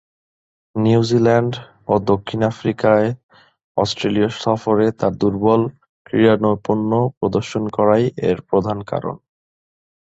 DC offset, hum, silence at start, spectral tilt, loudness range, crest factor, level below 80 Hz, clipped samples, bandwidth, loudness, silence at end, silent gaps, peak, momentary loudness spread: under 0.1%; none; 0.75 s; -7 dB/octave; 2 LU; 16 dB; -50 dBFS; under 0.1%; 8 kHz; -18 LUFS; 0.9 s; 3.23-3.29 s, 3.64-3.75 s, 5.89-6.05 s, 7.17-7.21 s; -2 dBFS; 10 LU